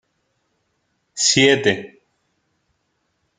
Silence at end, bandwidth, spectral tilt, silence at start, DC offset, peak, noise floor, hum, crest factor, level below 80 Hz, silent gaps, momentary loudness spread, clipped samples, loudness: 1.5 s; 9.6 kHz; -2.5 dB/octave; 1.15 s; under 0.1%; 0 dBFS; -70 dBFS; none; 22 dB; -62 dBFS; none; 22 LU; under 0.1%; -16 LUFS